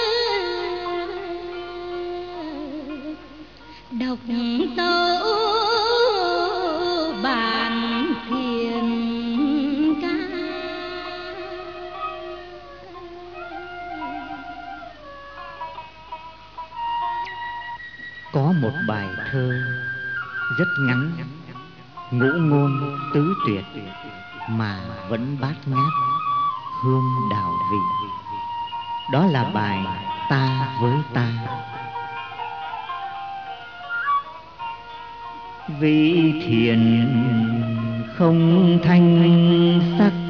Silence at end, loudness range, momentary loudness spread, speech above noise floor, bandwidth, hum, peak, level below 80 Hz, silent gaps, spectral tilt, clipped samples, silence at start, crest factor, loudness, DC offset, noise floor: 0 s; 13 LU; 19 LU; 24 dB; 6.8 kHz; none; -4 dBFS; -54 dBFS; none; -5 dB/octave; under 0.1%; 0 s; 18 dB; -22 LUFS; 0.3%; -43 dBFS